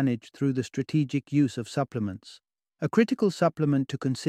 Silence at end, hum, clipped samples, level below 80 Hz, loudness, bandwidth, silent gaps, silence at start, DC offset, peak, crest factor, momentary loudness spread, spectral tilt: 0 s; none; under 0.1%; -68 dBFS; -27 LUFS; 12.5 kHz; none; 0 s; under 0.1%; -8 dBFS; 18 dB; 8 LU; -7 dB/octave